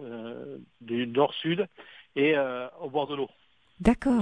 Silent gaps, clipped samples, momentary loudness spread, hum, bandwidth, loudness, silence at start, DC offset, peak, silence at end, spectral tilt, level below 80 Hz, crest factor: none; under 0.1%; 15 LU; none; 10.5 kHz; -28 LUFS; 0 s; under 0.1%; -8 dBFS; 0 s; -6.5 dB/octave; -48 dBFS; 20 dB